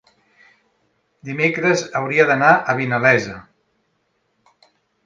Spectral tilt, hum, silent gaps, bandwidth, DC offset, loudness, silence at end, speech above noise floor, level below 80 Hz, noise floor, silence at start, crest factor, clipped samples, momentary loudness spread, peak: -5.5 dB/octave; none; none; 9.4 kHz; under 0.1%; -16 LUFS; 1.65 s; 51 dB; -62 dBFS; -68 dBFS; 1.25 s; 20 dB; under 0.1%; 17 LU; 0 dBFS